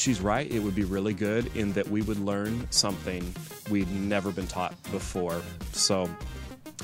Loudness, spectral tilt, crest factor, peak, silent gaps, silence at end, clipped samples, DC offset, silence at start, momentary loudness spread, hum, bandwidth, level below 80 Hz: -29 LUFS; -4 dB/octave; 22 dB; -8 dBFS; none; 0 s; under 0.1%; under 0.1%; 0 s; 10 LU; none; 16 kHz; -44 dBFS